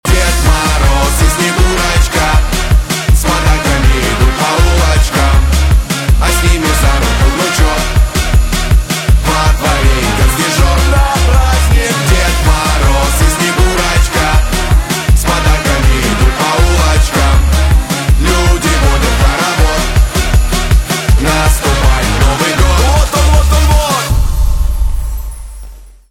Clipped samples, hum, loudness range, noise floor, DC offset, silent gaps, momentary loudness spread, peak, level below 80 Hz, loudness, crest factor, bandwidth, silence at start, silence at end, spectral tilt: under 0.1%; none; 1 LU; -30 dBFS; under 0.1%; none; 2 LU; 0 dBFS; -12 dBFS; -11 LUFS; 10 dB; 16.5 kHz; 0.05 s; 0.2 s; -4.5 dB/octave